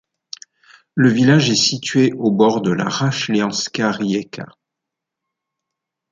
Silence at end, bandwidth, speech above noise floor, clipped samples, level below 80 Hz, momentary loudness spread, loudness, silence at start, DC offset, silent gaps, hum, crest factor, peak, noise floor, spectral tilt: 1.65 s; 9.4 kHz; 66 dB; under 0.1%; -60 dBFS; 22 LU; -17 LUFS; 0.95 s; under 0.1%; none; none; 16 dB; -2 dBFS; -83 dBFS; -5 dB/octave